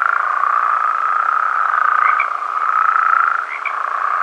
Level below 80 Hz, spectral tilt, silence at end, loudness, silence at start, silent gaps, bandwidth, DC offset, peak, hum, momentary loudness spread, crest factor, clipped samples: under -90 dBFS; 2 dB/octave; 0 s; -15 LUFS; 0 s; none; 9.2 kHz; under 0.1%; 0 dBFS; none; 6 LU; 16 dB; under 0.1%